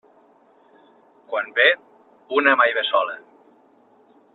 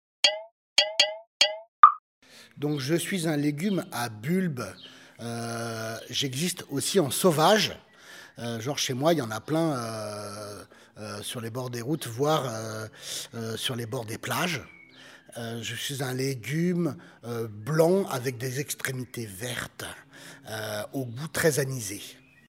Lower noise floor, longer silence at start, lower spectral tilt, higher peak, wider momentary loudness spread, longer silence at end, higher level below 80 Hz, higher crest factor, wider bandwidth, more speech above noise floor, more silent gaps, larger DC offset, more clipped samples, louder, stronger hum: first, -56 dBFS vs -51 dBFS; first, 1.3 s vs 0.25 s; about the same, -4.5 dB/octave vs -4 dB/octave; about the same, 0 dBFS vs 0 dBFS; second, 13 LU vs 16 LU; first, 1.15 s vs 0.35 s; second, -76 dBFS vs -70 dBFS; about the same, 24 dB vs 28 dB; second, 4.3 kHz vs 16 kHz; first, 36 dB vs 22 dB; second, none vs 0.52-0.76 s, 1.27-1.40 s, 1.68-1.83 s, 1.99-2.22 s; neither; neither; first, -19 LUFS vs -27 LUFS; neither